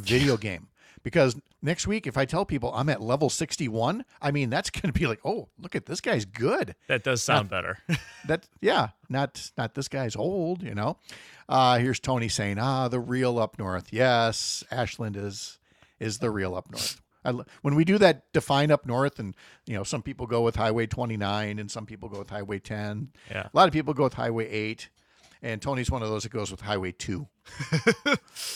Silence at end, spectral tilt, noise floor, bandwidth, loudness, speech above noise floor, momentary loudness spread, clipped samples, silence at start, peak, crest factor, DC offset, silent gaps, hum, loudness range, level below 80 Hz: 0 s; -5 dB/octave; -59 dBFS; 15.5 kHz; -27 LUFS; 31 dB; 13 LU; under 0.1%; 0 s; -6 dBFS; 22 dB; under 0.1%; none; none; 5 LU; -50 dBFS